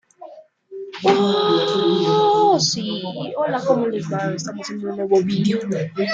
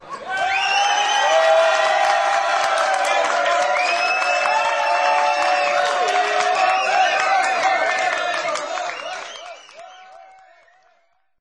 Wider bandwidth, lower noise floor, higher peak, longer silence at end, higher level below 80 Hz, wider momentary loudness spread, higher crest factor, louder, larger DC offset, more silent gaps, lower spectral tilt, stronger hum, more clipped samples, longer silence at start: second, 7.8 kHz vs 11.5 kHz; second, -42 dBFS vs -63 dBFS; about the same, -2 dBFS vs -4 dBFS; second, 0 s vs 1.15 s; first, -64 dBFS vs -70 dBFS; about the same, 12 LU vs 10 LU; about the same, 16 dB vs 16 dB; about the same, -19 LUFS vs -18 LUFS; neither; neither; first, -5 dB/octave vs 0.5 dB/octave; neither; neither; first, 0.2 s vs 0 s